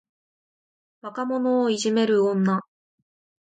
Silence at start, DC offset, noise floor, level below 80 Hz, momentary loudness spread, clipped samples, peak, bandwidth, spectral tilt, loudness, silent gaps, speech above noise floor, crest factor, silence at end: 1.05 s; under 0.1%; under -90 dBFS; -74 dBFS; 12 LU; under 0.1%; -12 dBFS; 9.4 kHz; -5.5 dB/octave; -23 LUFS; none; over 68 dB; 14 dB; 0.9 s